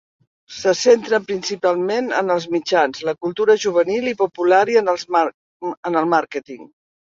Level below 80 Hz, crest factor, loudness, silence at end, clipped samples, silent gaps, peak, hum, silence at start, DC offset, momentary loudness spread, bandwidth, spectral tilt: -66 dBFS; 16 dB; -18 LUFS; 0.55 s; under 0.1%; 5.34-5.60 s, 5.77-5.83 s; -2 dBFS; none; 0.5 s; under 0.1%; 13 LU; 7.6 kHz; -4 dB/octave